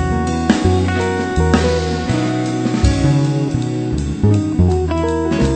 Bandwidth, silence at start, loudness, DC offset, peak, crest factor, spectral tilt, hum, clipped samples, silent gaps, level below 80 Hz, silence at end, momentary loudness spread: 9 kHz; 0 s; -16 LUFS; under 0.1%; 0 dBFS; 16 dB; -6.5 dB/octave; none; under 0.1%; none; -26 dBFS; 0 s; 4 LU